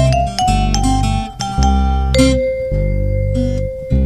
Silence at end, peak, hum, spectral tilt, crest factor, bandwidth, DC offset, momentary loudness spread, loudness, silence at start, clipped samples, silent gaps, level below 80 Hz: 0 s; 0 dBFS; none; -6 dB/octave; 14 dB; 13 kHz; under 0.1%; 6 LU; -16 LUFS; 0 s; under 0.1%; none; -18 dBFS